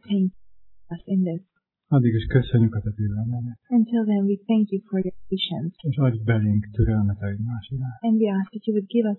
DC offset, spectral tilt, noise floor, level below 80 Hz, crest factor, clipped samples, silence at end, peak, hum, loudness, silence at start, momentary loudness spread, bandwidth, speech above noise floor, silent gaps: under 0.1%; -11.5 dB/octave; -69 dBFS; -42 dBFS; 18 dB; under 0.1%; 0 s; -4 dBFS; none; -24 LUFS; 0.05 s; 8 LU; 4.2 kHz; 46 dB; none